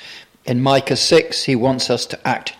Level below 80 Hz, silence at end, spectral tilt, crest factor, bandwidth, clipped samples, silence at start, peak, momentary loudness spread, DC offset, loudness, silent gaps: -54 dBFS; 0.05 s; -4 dB/octave; 16 dB; 16 kHz; under 0.1%; 0 s; -2 dBFS; 9 LU; under 0.1%; -17 LUFS; none